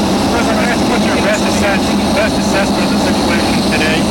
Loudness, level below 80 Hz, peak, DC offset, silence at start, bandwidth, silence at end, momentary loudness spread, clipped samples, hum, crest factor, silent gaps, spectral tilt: -13 LUFS; -30 dBFS; -4 dBFS; under 0.1%; 0 s; 16.5 kHz; 0 s; 1 LU; under 0.1%; none; 8 dB; none; -4.5 dB/octave